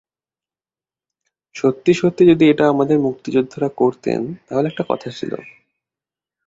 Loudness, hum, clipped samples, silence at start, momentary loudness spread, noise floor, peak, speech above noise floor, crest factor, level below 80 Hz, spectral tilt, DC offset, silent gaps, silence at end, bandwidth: -17 LUFS; none; under 0.1%; 1.55 s; 14 LU; under -90 dBFS; -2 dBFS; over 73 dB; 18 dB; -58 dBFS; -7 dB/octave; under 0.1%; none; 0.95 s; 7.8 kHz